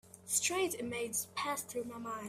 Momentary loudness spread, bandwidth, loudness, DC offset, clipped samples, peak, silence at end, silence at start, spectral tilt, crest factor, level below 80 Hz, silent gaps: 10 LU; 16 kHz; -36 LUFS; under 0.1%; under 0.1%; -18 dBFS; 0 s; 0.05 s; -1.5 dB/octave; 20 dB; -76 dBFS; none